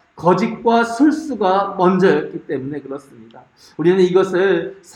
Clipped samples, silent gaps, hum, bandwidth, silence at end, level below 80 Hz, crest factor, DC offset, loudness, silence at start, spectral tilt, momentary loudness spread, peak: under 0.1%; none; none; 10.5 kHz; 0.2 s; -60 dBFS; 16 dB; under 0.1%; -16 LUFS; 0.15 s; -7 dB/octave; 11 LU; -2 dBFS